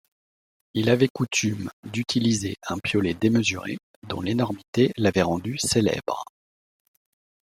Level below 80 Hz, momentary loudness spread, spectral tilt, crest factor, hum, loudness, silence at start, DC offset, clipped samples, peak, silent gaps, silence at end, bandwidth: -58 dBFS; 11 LU; -5 dB/octave; 20 dB; none; -24 LUFS; 0.75 s; under 0.1%; under 0.1%; -6 dBFS; 1.10-1.15 s, 1.73-1.83 s, 3.83-4.02 s, 4.68-4.73 s; 1.2 s; 16 kHz